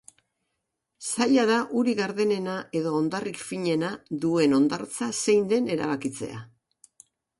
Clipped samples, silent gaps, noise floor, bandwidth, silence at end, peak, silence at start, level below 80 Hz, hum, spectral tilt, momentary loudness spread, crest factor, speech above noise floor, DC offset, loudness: under 0.1%; none; -81 dBFS; 11.5 kHz; 0.95 s; -10 dBFS; 1 s; -68 dBFS; none; -4.5 dB/octave; 11 LU; 16 dB; 56 dB; under 0.1%; -25 LUFS